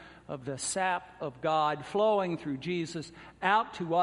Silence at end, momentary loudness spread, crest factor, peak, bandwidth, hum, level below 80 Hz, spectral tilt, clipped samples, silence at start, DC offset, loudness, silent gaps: 0 s; 13 LU; 20 dB; -12 dBFS; 11.5 kHz; none; -66 dBFS; -4 dB/octave; under 0.1%; 0 s; under 0.1%; -31 LUFS; none